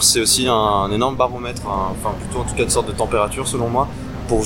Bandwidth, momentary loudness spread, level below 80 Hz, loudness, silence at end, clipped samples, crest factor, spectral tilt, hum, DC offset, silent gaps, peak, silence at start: 17.5 kHz; 10 LU; -34 dBFS; -19 LUFS; 0 s; under 0.1%; 16 dB; -3.5 dB/octave; none; 0.3%; none; -2 dBFS; 0 s